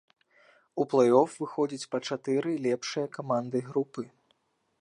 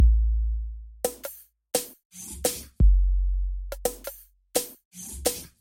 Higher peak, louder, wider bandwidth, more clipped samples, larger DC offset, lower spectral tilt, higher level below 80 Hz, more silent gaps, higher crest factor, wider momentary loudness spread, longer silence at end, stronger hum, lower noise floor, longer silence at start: about the same, -8 dBFS vs -8 dBFS; about the same, -29 LUFS vs -28 LUFS; second, 11 kHz vs 17 kHz; neither; neither; about the same, -5.5 dB/octave vs -4.5 dB/octave; second, -82 dBFS vs -26 dBFS; second, none vs 2.05-2.10 s, 4.85-4.91 s; about the same, 22 dB vs 18 dB; second, 12 LU vs 17 LU; first, 0.75 s vs 0.15 s; neither; first, -72 dBFS vs -43 dBFS; first, 0.75 s vs 0 s